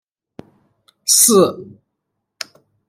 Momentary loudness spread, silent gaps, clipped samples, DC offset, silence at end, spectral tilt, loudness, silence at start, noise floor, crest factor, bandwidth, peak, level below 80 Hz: 22 LU; none; under 0.1%; under 0.1%; 1.25 s; -2.5 dB/octave; -12 LUFS; 1.05 s; -76 dBFS; 20 dB; 16.5 kHz; 0 dBFS; -66 dBFS